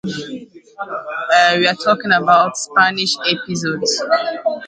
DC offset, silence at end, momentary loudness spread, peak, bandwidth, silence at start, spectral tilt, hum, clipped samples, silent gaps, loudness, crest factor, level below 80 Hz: under 0.1%; 0 s; 15 LU; 0 dBFS; 9.6 kHz; 0.05 s; -3 dB/octave; none; under 0.1%; none; -15 LUFS; 16 dB; -64 dBFS